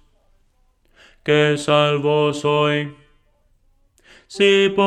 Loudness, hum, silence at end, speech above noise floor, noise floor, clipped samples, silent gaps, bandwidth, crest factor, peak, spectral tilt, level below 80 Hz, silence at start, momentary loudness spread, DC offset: -17 LUFS; none; 0 s; 43 dB; -60 dBFS; under 0.1%; none; 10.5 kHz; 18 dB; -2 dBFS; -5 dB/octave; -58 dBFS; 1.25 s; 13 LU; under 0.1%